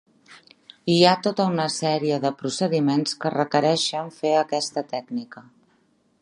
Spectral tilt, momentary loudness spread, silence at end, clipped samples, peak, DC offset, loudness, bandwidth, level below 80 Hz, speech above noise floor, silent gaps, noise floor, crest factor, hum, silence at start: -5 dB/octave; 12 LU; 0.8 s; under 0.1%; -2 dBFS; under 0.1%; -23 LUFS; 11.5 kHz; -72 dBFS; 42 dB; none; -64 dBFS; 22 dB; none; 0.3 s